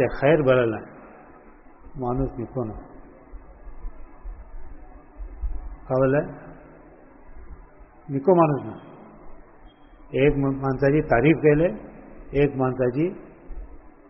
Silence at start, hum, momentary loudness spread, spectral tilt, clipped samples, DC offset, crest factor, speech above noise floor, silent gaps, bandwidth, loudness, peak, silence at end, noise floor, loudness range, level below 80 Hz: 0 s; none; 25 LU; -5 dB/octave; under 0.1%; 0.1%; 20 dB; 27 dB; none; 3.7 kHz; -22 LUFS; -4 dBFS; 0.2 s; -49 dBFS; 12 LU; -40 dBFS